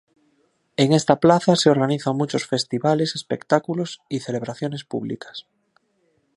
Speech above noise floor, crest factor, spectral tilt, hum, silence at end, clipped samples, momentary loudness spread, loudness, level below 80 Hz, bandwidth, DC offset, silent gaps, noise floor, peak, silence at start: 46 dB; 22 dB; -5.5 dB/octave; none; 0.95 s; under 0.1%; 13 LU; -21 LUFS; -64 dBFS; 11.5 kHz; under 0.1%; none; -67 dBFS; 0 dBFS; 0.8 s